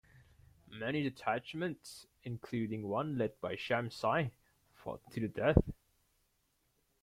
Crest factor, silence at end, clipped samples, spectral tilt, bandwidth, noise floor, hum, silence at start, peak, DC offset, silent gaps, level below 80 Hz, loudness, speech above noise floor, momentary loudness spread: 30 dB; 1.3 s; under 0.1%; -7 dB/octave; 16 kHz; -78 dBFS; none; 0.15 s; -8 dBFS; under 0.1%; none; -52 dBFS; -37 LUFS; 42 dB; 17 LU